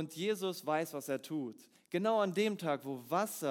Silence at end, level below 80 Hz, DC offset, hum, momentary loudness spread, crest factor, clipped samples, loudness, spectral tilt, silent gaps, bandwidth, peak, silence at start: 0 s; under -90 dBFS; under 0.1%; none; 9 LU; 16 dB; under 0.1%; -36 LUFS; -5 dB/octave; none; 18 kHz; -20 dBFS; 0 s